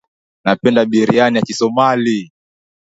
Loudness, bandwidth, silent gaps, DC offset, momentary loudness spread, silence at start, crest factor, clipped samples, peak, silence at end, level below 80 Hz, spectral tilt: -14 LUFS; 8 kHz; none; under 0.1%; 6 LU; 0.45 s; 16 dB; under 0.1%; 0 dBFS; 0.7 s; -58 dBFS; -5.5 dB/octave